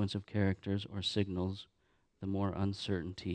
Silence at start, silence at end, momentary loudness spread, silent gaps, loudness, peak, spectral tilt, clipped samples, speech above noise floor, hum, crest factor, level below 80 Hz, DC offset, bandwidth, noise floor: 0 s; 0 s; 6 LU; none; -37 LUFS; -18 dBFS; -6.5 dB/octave; under 0.1%; 20 dB; none; 18 dB; -62 dBFS; under 0.1%; 9.6 kHz; -56 dBFS